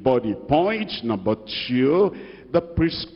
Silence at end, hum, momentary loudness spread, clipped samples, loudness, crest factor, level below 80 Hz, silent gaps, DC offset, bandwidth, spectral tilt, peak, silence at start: 0 s; none; 7 LU; under 0.1%; -22 LUFS; 16 dB; -42 dBFS; none; under 0.1%; 5.8 kHz; -9.5 dB/octave; -6 dBFS; 0 s